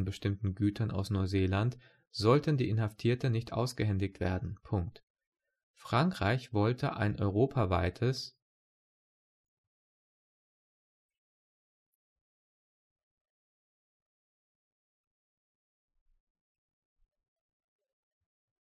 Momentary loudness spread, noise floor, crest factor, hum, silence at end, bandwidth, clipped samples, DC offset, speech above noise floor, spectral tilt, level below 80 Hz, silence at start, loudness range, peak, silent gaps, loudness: 7 LU; under -90 dBFS; 22 dB; none; 10.35 s; 13 kHz; under 0.1%; under 0.1%; over 59 dB; -7 dB/octave; -58 dBFS; 0 s; 4 LU; -12 dBFS; 5.03-5.15 s, 5.27-5.32 s, 5.63-5.74 s; -32 LUFS